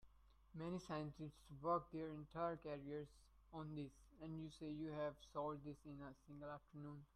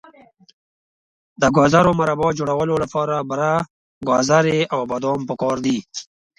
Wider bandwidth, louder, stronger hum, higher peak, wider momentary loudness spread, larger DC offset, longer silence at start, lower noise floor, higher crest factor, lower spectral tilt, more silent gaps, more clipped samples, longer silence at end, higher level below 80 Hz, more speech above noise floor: first, 12.5 kHz vs 11 kHz; second, -51 LUFS vs -19 LUFS; neither; second, -30 dBFS vs 0 dBFS; first, 12 LU vs 9 LU; neither; second, 0.05 s vs 1.4 s; first, -70 dBFS vs -49 dBFS; about the same, 20 dB vs 20 dB; first, -7.5 dB/octave vs -5.5 dB/octave; second, none vs 3.70-4.01 s; neither; second, 0.1 s vs 0.35 s; second, -72 dBFS vs -50 dBFS; second, 20 dB vs 31 dB